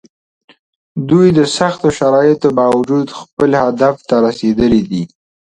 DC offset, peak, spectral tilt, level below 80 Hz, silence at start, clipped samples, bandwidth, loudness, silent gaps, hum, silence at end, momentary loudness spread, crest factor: under 0.1%; 0 dBFS; -6.5 dB/octave; -44 dBFS; 0.95 s; under 0.1%; 11 kHz; -13 LUFS; 3.33-3.37 s; none; 0.45 s; 11 LU; 14 dB